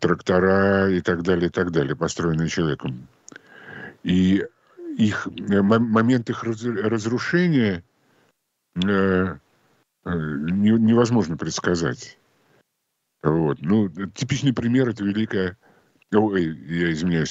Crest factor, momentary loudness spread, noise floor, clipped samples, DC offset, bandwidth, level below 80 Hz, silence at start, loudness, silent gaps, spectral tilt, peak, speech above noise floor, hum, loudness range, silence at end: 18 dB; 13 LU; -76 dBFS; under 0.1%; under 0.1%; 8 kHz; -52 dBFS; 0 s; -22 LUFS; none; -6.5 dB/octave; -4 dBFS; 55 dB; none; 3 LU; 0 s